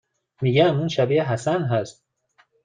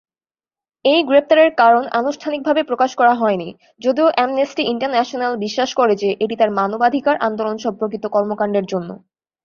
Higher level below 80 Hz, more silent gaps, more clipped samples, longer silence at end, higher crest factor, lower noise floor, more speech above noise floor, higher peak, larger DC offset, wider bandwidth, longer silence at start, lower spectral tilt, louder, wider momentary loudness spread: about the same, -62 dBFS vs -64 dBFS; neither; neither; first, 0.75 s vs 0.5 s; about the same, 18 dB vs 16 dB; second, -63 dBFS vs under -90 dBFS; second, 42 dB vs over 73 dB; about the same, -4 dBFS vs -2 dBFS; neither; first, 9.4 kHz vs 7.2 kHz; second, 0.4 s vs 0.85 s; first, -6.5 dB/octave vs -5 dB/octave; second, -21 LUFS vs -17 LUFS; about the same, 8 LU vs 9 LU